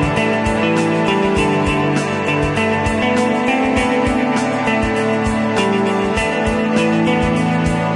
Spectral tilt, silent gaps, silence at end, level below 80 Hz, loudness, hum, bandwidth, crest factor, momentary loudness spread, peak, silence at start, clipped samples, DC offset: -6 dB/octave; none; 0 s; -34 dBFS; -16 LUFS; none; 11.5 kHz; 12 dB; 2 LU; -2 dBFS; 0 s; under 0.1%; under 0.1%